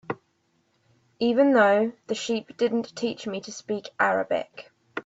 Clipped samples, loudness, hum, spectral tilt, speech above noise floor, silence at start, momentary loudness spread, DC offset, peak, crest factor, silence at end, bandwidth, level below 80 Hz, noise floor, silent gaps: under 0.1%; -25 LUFS; none; -4.5 dB/octave; 45 dB; 0.1 s; 18 LU; under 0.1%; -8 dBFS; 18 dB; 0.05 s; 8 kHz; -72 dBFS; -69 dBFS; none